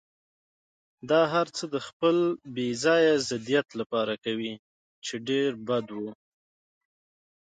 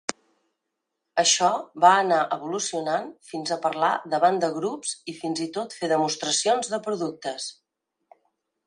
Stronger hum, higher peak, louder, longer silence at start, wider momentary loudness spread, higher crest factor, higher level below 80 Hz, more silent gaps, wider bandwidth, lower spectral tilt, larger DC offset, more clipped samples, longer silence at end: neither; second, -10 dBFS vs -2 dBFS; second, -27 LUFS vs -24 LUFS; first, 1.05 s vs 0.1 s; about the same, 14 LU vs 13 LU; second, 18 dB vs 24 dB; first, -72 dBFS vs -78 dBFS; first, 1.93-2.00 s, 3.86-3.90 s, 4.59-5.02 s vs none; second, 9.4 kHz vs 11 kHz; first, -4.5 dB/octave vs -2 dB/octave; neither; neither; first, 1.35 s vs 1.15 s